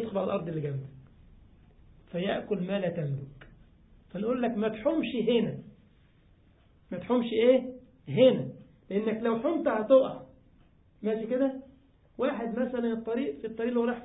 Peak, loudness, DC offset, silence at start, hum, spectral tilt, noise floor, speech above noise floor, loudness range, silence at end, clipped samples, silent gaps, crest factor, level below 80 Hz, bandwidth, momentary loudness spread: -10 dBFS; -29 LUFS; under 0.1%; 0 s; none; -10.5 dB/octave; -61 dBFS; 33 dB; 7 LU; 0 s; under 0.1%; none; 20 dB; -62 dBFS; 4 kHz; 17 LU